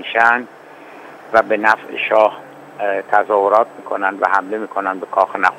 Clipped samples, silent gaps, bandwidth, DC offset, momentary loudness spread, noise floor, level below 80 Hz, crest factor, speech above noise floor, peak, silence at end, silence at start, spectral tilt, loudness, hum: under 0.1%; none; 12.5 kHz; under 0.1%; 12 LU; -38 dBFS; -68 dBFS; 18 dB; 22 dB; 0 dBFS; 0 s; 0 s; -4.5 dB/octave; -16 LUFS; none